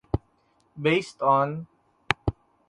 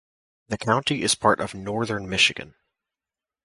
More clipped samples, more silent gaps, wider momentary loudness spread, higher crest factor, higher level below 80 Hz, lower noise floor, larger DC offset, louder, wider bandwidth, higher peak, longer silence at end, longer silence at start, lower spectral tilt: neither; neither; about the same, 10 LU vs 10 LU; about the same, 26 dB vs 22 dB; first, -44 dBFS vs -54 dBFS; second, -66 dBFS vs under -90 dBFS; neither; second, -26 LUFS vs -22 LUFS; about the same, 11.5 kHz vs 12 kHz; first, 0 dBFS vs -4 dBFS; second, 0.35 s vs 0.95 s; second, 0.15 s vs 0.5 s; first, -6 dB/octave vs -3 dB/octave